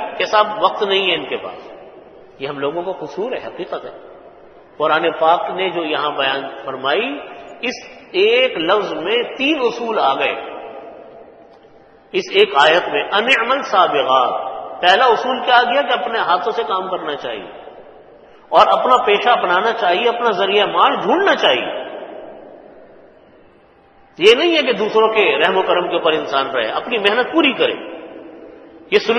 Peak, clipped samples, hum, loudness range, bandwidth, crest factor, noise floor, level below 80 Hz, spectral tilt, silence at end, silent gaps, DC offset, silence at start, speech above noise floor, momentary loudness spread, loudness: 0 dBFS; under 0.1%; none; 6 LU; 9 kHz; 18 dB; -49 dBFS; -60 dBFS; -3.5 dB/octave; 0 s; none; under 0.1%; 0 s; 33 dB; 16 LU; -16 LUFS